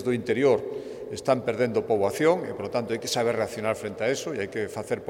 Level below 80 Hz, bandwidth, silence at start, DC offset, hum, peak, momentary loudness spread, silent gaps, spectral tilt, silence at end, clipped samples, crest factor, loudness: -64 dBFS; 16 kHz; 0 s; under 0.1%; none; -8 dBFS; 8 LU; none; -5 dB/octave; 0 s; under 0.1%; 18 dB; -26 LUFS